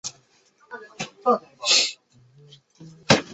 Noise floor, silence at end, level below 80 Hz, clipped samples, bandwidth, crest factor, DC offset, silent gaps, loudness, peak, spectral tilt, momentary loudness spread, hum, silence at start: -60 dBFS; 0 s; -60 dBFS; under 0.1%; 8.4 kHz; 26 dB; under 0.1%; none; -21 LUFS; 0 dBFS; -2.5 dB/octave; 24 LU; none; 0.05 s